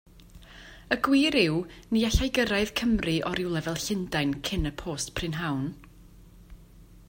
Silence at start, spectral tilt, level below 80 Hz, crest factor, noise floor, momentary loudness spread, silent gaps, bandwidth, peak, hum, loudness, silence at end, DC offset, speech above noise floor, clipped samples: 0.35 s; -4.5 dB/octave; -42 dBFS; 22 dB; -51 dBFS; 10 LU; none; 16.5 kHz; -8 dBFS; none; -27 LUFS; 0.15 s; under 0.1%; 24 dB; under 0.1%